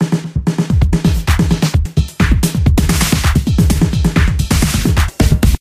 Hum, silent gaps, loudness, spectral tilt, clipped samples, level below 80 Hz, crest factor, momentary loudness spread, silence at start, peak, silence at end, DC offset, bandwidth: none; none; -14 LUFS; -5.5 dB/octave; under 0.1%; -16 dBFS; 12 dB; 3 LU; 0 s; 0 dBFS; 0.05 s; under 0.1%; 16 kHz